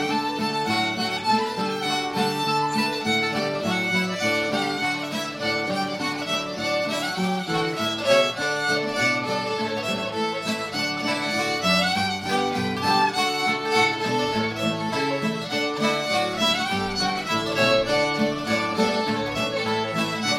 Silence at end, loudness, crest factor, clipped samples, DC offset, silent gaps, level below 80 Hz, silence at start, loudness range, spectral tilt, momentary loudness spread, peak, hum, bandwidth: 0 s; -23 LUFS; 18 dB; under 0.1%; under 0.1%; none; -56 dBFS; 0 s; 2 LU; -3.5 dB/octave; 5 LU; -6 dBFS; none; 16 kHz